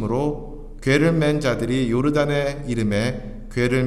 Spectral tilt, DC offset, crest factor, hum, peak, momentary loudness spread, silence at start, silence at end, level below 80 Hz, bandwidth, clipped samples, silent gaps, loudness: -6.5 dB/octave; under 0.1%; 16 dB; none; -4 dBFS; 11 LU; 0 s; 0 s; -36 dBFS; 13.5 kHz; under 0.1%; none; -21 LUFS